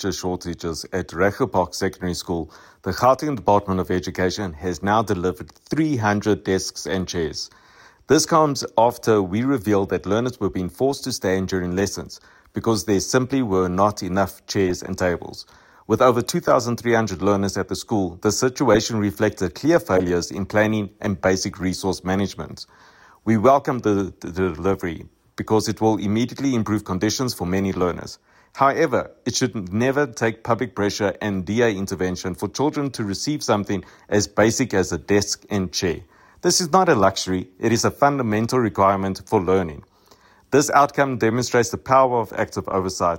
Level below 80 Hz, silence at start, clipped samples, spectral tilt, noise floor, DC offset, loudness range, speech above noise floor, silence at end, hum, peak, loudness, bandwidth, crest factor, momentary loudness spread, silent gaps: -48 dBFS; 0 s; under 0.1%; -5 dB/octave; -54 dBFS; under 0.1%; 3 LU; 33 dB; 0 s; none; -2 dBFS; -21 LUFS; 16.5 kHz; 18 dB; 10 LU; none